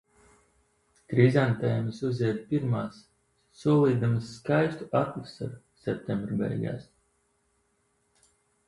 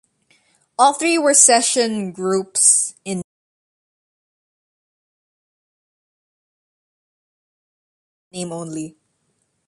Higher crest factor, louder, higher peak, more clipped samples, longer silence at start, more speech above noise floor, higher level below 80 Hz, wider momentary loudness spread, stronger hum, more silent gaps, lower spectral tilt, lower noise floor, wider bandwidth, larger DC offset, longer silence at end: about the same, 22 dB vs 22 dB; second, -28 LUFS vs -14 LUFS; second, -8 dBFS vs 0 dBFS; neither; first, 1.1 s vs 0.8 s; second, 45 dB vs 52 dB; first, -62 dBFS vs -70 dBFS; second, 15 LU vs 20 LU; neither; second, none vs 3.24-8.31 s; first, -8.5 dB/octave vs -2 dB/octave; about the same, -72 dBFS vs -69 dBFS; about the same, 11 kHz vs 12 kHz; neither; first, 1.85 s vs 0.8 s